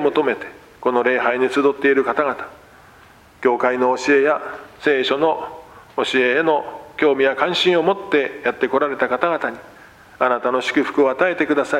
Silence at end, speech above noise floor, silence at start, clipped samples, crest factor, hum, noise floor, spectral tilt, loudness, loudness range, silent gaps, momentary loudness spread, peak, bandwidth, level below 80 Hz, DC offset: 0 s; 29 dB; 0 s; under 0.1%; 18 dB; none; -47 dBFS; -4.5 dB/octave; -18 LUFS; 2 LU; none; 10 LU; -2 dBFS; 11.5 kHz; -60 dBFS; under 0.1%